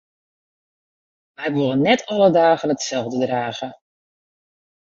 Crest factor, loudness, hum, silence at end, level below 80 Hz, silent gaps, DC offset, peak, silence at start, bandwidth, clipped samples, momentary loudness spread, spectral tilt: 20 dB; -19 LUFS; none; 1.1 s; -64 dBFS; none; under 0.1%; -2 dBFS; 1.4 s; 7.8 kHz; under 0.1%; 13 LU; -5 dB/octave